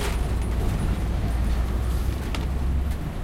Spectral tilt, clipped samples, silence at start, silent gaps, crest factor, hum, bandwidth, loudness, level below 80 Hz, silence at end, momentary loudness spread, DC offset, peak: -6.5 dB/octave; under 0.1%; 0 s; none; 12 dB; none; 15.5 kHz; -27 LUFS; -26 dBFS; 0 s; 2 LU; under 0.1%; -12 dBFS